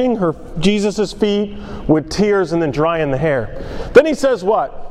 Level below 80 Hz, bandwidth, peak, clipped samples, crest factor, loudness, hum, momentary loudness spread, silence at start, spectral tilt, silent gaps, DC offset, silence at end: -34 dBFS; 12.5 kHz; 0 dBFS; 0.2%; 16 dB; -16 LUFS; none; 9 LU; 0 s; -6 dB/octave; none; under 0.1%; 0 s